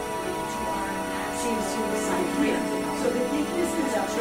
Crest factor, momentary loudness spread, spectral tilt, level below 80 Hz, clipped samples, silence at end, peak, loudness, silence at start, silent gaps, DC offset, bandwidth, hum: 14 dB; 4 LU; -4 dB/octave; -50 dBFS; under 0.1%; 0 s; -12 dBFS; -27 LUFS; 0 s; none; under 0.1%; 16 kHz; none